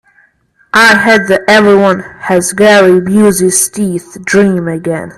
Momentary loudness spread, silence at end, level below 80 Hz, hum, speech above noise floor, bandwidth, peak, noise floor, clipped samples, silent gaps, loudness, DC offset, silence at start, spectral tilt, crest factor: 11 LU; 0.05 s; -46 dBFS; none; 43 dB; 15 kHz; 0 dBFS; -51 dBFS; 0.2%; none; -8 LUFS; under 0.1%; 0.75 s; -4 dB/octave; 8 dB